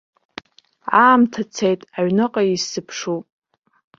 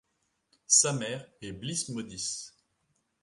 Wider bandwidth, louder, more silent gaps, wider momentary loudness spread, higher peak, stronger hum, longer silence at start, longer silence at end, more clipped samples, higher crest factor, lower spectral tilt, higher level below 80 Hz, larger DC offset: second, 7.6 kHz vs 11.5 kHz; first, -18 LUFS vs -27 LUFS; neither; first, 25 LU vs 18 LU; first, -2 dBFS vs -8 dBFS; neither; first, 0.85 s vs 0.7 s; about the same, 0.75 s vs 0.75 s; neither; second, 18 dB vs 26 dB; first, -4.5 dB/octave vs -2 dB/octave; about the same, -64 dBFS vs -66 dBFS; neither